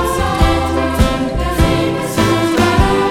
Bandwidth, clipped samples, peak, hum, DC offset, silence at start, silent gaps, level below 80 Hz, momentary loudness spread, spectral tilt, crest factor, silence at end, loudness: 17 kHz; under 0.1%; -2 dBFS; none; under 0.1%; 0 s; none; -20 dBFS; 4 LU; -5.5 dB/octave; 12 dB; 0 s; -14 LUFS